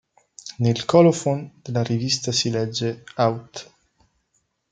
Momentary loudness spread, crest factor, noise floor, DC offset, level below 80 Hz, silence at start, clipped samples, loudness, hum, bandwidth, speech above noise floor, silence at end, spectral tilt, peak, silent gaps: 20 LU; 20 dB; -70 dBFS; under 0.1%; -62 dBFS; 0.45 s; under 0.1%; -21 LUFS; none; 9.4 kHz; 49 dB; 1.1 s; -5 dB/octave; -2 dBFS; none